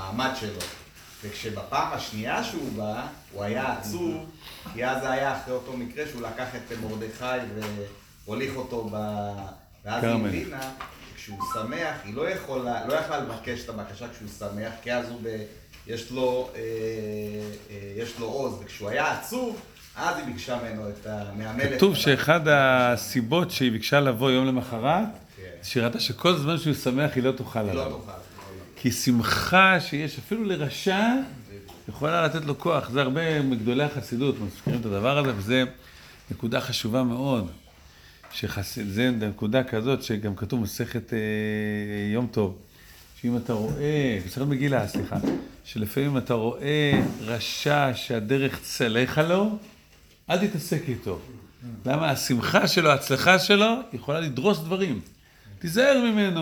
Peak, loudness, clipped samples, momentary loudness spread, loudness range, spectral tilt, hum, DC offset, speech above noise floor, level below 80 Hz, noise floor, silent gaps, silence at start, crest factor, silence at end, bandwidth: -2 dBFS; -26 LUFS; under 0.1%; 16 LU; 9 LU; -5 dB/octave; none; under 0.1%; 29 dB; -54 dBFS; -55 dBFS; none; 0 s; 24 dB; 0 s; over 20 kHz